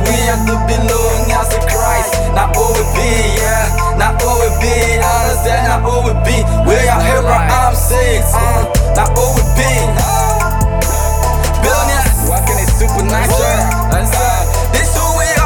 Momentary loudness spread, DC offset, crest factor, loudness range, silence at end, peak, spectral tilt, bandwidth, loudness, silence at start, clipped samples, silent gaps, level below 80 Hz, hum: 2 LU; under 0.1%; 10 dB; 1 LU; 0 s; 0 dBFS; -4.5 dB/octave; 19.5 kHz; -12 LUFS; 0 s; under 0.1%; none; -16 dBFS; none